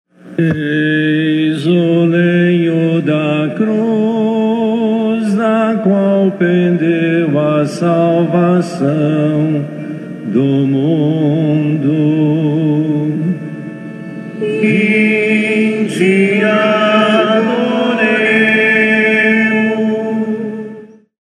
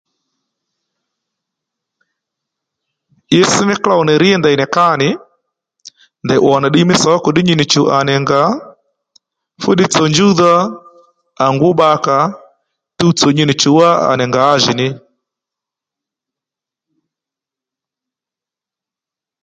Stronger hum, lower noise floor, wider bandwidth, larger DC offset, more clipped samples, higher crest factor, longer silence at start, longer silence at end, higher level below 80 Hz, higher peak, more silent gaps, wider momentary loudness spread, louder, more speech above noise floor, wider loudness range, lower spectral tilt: neither; second, -34 dBFS vs -87 dBFS; first, 10.5 kHz vs 9.4 kHz; neither; neither; about the same, 12 dB vs 14 dB; second, 0.25 s vs 3.3 s; second, 0.4 s vs 4.45 s; second, -64 dBFS vs -54 dBFS; about the same, 0 dBFS vs 0 dBFS; neither; about the same, 9 LU vs 7 LU; about the same, -13 LUFS vs -11 LUFS; second, 22 dB vs 76 dB; about the same, 4 LU vs 5 LU; first, -7.5 dB/octave vs -4.5 dB/octave